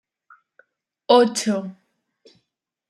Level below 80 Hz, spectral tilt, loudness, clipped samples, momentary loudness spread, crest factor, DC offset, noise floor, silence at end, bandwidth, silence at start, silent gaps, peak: -76 dBFS; -4 dB/octave; -19 LUFS; under 0.1%; 22 LU; 22 dB; under 0.1%; -78 dBFS; 1.2 s; 13.5 kHz; 1.1 s; none; -2 dBFS